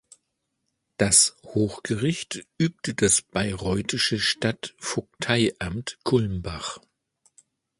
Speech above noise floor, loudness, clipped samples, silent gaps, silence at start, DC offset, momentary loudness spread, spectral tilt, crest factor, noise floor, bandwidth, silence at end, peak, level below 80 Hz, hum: 53 dB; -24 LUFS; under 0.1%; none; 1 s; under 0.1%; 13 LU; -3 dB/octave; 22 dB; -78 dBFS; 11.5 kHz; 1 s; -4 dBFS; -48 dBFS; none